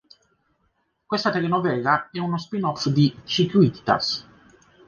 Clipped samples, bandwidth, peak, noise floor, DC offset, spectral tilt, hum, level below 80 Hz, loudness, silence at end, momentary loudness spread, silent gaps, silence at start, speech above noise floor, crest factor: under 0.1%; 7.2 kHz; -4 dBFS; -70 dBFS; under 0.1%; -6 dB/octave; none; -60 dBFS; -22 LUFS; 0.65 s; 8 LU; none; 1.1 s; 48 dB; 20 dB